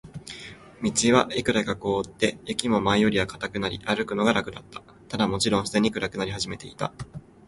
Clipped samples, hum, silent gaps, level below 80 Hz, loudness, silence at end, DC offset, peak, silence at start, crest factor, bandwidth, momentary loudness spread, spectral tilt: under 0.1%; none; none; -50 dBFS; -25 LUFS; 0.3 s; under 0.1%; -4 dBFS; 0.05 s; 22 dB; 11.5 kHz; 18 LU; -4 dB/octave